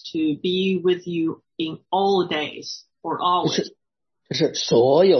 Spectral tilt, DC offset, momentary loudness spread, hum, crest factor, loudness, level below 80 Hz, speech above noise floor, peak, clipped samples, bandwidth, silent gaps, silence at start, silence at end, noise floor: -5 dB/octave; under 0.1%; 11 LU; none; 16 dB; -22 LUFS; -68 dBFS; 56 dB; -4 dBFS; under 0.1%; 6.4 kHz; none; 0.05 s; 0 s; -77 dBFS